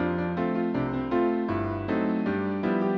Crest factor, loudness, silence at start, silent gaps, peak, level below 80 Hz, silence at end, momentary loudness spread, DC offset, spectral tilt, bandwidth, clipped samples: 14 dB; -27 LUFS; 0 s; none; -12 dBFS; -52 dBFS; 0 s; 3 LU; under 0.1%; -9.5 dB/octave; 6 kHz; under 0.1%